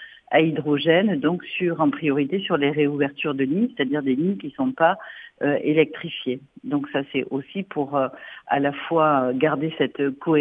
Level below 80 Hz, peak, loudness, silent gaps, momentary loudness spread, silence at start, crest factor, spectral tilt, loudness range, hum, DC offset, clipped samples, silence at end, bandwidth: -68 dBFS; -4 dBFS; -23 LUFS; none; 9 LU; 0 s; 18 dB; -9 dB/octave; 3 LU; none; under 0.1%; under 0.1%; 0 s; 4.8 kHz